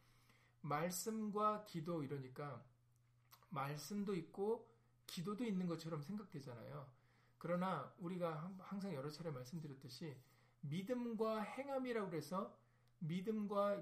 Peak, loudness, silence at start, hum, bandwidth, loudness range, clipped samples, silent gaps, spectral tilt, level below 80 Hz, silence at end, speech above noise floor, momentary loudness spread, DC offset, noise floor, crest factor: -28 dBFS; -46 LUFS; 0.65 s; none; 15 kHz; 3 LU; under 0.1%; none; -6 dB/octave; -84 dBFS; 0 s; 30 dB; 12 LU; under 0.1%; -75 dBFS; 18 dB